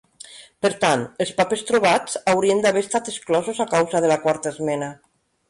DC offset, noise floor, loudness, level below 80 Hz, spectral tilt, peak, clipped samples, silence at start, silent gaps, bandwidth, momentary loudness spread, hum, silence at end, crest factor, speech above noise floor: under 0.1%; -44 dBFS; -21 LUFS; -62 dBFS; -4 dB/octave; -6 dBFS; under 0.1%; 0.3 s; none; 11.5 kHz; 8 LU; none; 0.55 s; 14 dB; 24 dB